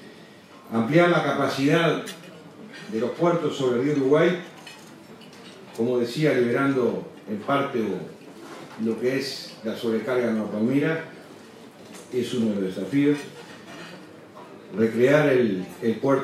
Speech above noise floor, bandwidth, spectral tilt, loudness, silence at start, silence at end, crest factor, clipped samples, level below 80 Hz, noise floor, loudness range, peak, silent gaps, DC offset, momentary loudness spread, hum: 24 dB; 14 kHz; -6.5 dB/octave; -24 LUFS; 0 s; 0 s; 18 dB; under 0.1%; -74 dBFS; -47 dBFS; 4 LU; -6 dBFS; none; under 0.1%; 24 LU; none